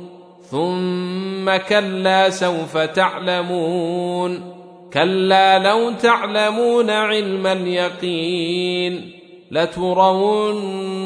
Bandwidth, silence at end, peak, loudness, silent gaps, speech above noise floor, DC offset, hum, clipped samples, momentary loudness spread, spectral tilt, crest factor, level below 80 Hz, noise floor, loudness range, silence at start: 10.5 kHz; 0 s; -2 dBFS; -18 LUFS; none; 22 dB; under 0.1%; none; under 0.1%; 9 LU; -5 dB/octave; 18 dB; -62 dBFS; -40 dBFS; 3 LU; 0 s